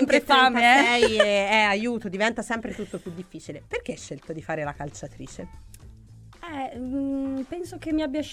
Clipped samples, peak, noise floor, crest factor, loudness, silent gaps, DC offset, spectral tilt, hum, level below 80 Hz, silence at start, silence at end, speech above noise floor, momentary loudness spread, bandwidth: under 0.1%; -2 dBFS; -48 dBFS; 22 dB; -23 LUFS; none; under 0.1%; -3.5 dB/octave; none; -50 dBFS; 0 s; 0 s; 23 dB; 22 LU; 15.5 kHz